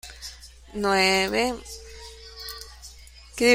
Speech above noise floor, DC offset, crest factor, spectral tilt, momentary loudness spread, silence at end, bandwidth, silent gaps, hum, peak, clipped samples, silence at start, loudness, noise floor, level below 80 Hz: 23 dB; under 0.1%; 20 dB; -3 dB/octave; 22 LU; 0 s; 16.5 kHz; none; none; -6 dBFS; under 0.1%; 0.05 s; -23 LUFS; -46 dBFS; -48 dBFS